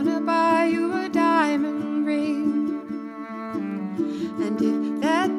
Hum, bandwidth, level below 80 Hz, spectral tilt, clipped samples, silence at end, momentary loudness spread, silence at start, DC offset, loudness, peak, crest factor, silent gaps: none; 12 kHz; -68 dBFS; -6 dB/octave; under 0.1%; 0 s; 11 LU; 0 s; under 0.1%; -24 LUFS; -8 dBFS; 14 dB; none